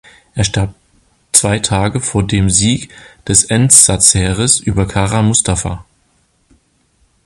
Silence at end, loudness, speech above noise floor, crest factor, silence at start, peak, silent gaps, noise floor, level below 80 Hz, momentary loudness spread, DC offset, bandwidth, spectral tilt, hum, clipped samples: 1.45 s; -11 LUFS; 45 dB; 14 dB; 0.35 s; 0 dBFS; none; -57 dBFS; -32 dBFS; 15 LU; under 0.1%; 16 kHz; -3.5 dB/octave; none; 0.4%